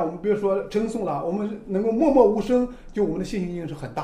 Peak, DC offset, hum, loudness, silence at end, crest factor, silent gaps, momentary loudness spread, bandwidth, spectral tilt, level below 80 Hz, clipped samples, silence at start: -6 dBFS; under 0.1%; none; -23 LUFS; 0 s; 18 dB; none; 11 LU; 11.5 kHz; -7.5 dB/octave; -44 dBFS; under 0.1%; 0 s